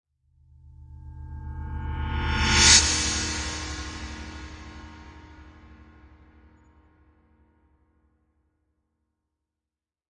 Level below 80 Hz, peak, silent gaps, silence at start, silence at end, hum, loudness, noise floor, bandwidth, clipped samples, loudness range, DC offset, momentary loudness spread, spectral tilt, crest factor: -38 dBFS; -4 dBFS; none; 0.65 s; 4.45 s; none; -21 LUFS; -90 dBFS; 11 kHz; under 0.1%; 19 LU; under 0.1%; 29 LU; -1.5 dB/octave; 26 dB